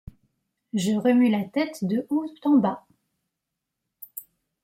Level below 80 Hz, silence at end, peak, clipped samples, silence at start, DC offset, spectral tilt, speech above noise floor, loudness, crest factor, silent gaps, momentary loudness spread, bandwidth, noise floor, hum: -60 dBFS; 0.4 s; -10 dBFS; under 0.1%; 0.75 s; under 0.1%; -6.5 dB/octave; 61 dB; -24 LUFS; 16 dB; none; 19 LU; 16.5 kHz; -83 dBFS; none